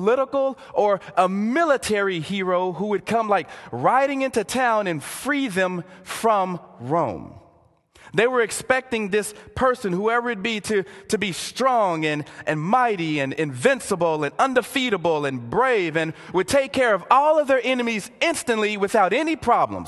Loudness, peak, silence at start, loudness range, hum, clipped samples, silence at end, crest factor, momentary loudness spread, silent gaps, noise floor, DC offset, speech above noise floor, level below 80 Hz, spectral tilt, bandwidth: -22 LUFS; -2 dBFS; 0 s; 4 LU; none; under 0.1%; 0 s; 20 dB; 6 LU; none; -57 dBFS; under 0.1%; 35 dB; -56 dBFS; -4.5 dB/octave; 12.5 kHz